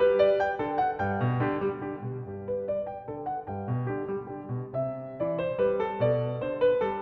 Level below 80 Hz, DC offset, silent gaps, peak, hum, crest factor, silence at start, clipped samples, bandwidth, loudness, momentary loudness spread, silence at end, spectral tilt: -58 dBFS; under 0.1%; none; -10 dBFS; none; 18 dB; 0 s; under 0.1%; 6 kHz; -29 LUFS; 11 LU; 0 s; -9.5 dB/octave